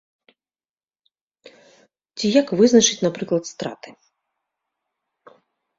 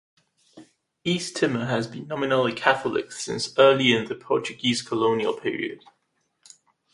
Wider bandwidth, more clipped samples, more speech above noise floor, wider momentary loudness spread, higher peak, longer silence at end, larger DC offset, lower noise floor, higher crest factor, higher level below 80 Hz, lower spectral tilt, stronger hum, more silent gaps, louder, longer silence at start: second, 7.8 kHz vs 11.5 kHz; neither; first, over 71 dB vs 49 dB; first, 18 LU vs 13 LU; about the same, -2 dBFS vs -2 dBFS; first, 1.9 s vs 1.15 s; neither; first, under -90 dBFS vs -73 dBFS; about the same, 20 dB vs 24 dB; about the same, -66 dBFS vs -66 dBFS; about the same, -3.5 dB/octave vs -4.5 dB/octave; neither; neither; first, -19 LUFS vs -24 LUFS; first, 2.15 s vs 0.55 s